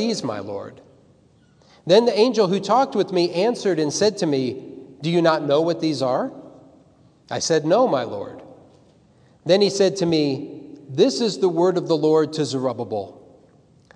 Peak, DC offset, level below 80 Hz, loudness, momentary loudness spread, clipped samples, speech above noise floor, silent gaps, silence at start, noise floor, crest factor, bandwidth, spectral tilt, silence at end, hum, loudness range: -2 dBFS; under 0.1%; -68 dBFS; -20 LUFS; 15 LU; under 0.1%; 36 dB; none; 0 s; -56 dBFS; 18 dB; 10.5 kHz; -5 dB/octave; 0.85 s; none; 4 LU